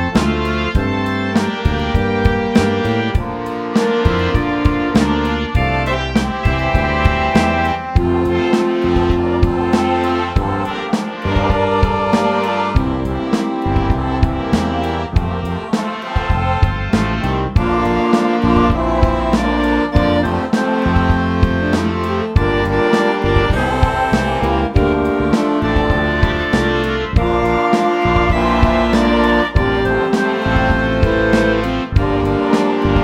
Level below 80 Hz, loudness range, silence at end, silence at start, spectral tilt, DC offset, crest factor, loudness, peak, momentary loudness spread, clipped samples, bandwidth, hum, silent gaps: -24 dBFS; 3 LU; 0 s; 0 s; -7 dB/octave; under 0.1%; 16 dB; -16 LUFS; 0 dBFS; 4 LU; under 0.1%; 14 kHz; none; none